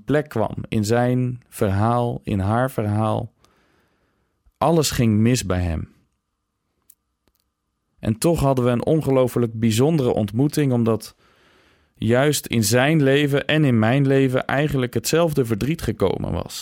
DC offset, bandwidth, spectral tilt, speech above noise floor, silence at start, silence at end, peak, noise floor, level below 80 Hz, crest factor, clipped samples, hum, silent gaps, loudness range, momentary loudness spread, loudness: under 0.1%; 17 kHz; -6 dB/octave; 56 dB; 0.1 s; 0 s; -6 dBFS; -75 dBFS; -46 dBFS; 14 dB; under 0.1%; none; none; 5 LU; 8 LU; -20 LUFS